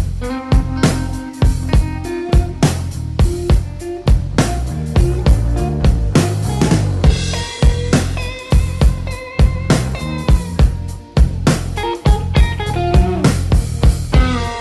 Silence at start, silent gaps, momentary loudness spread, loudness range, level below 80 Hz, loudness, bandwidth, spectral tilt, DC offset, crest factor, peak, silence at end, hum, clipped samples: 0 s; none; 7 LU; 2 LU; -18 dBFS; -16 LUFS; 12.5 kHz; -6 dB/octave; under 0.1%; 14 dB; 0 dBFS; 0 s; none; under 0.1%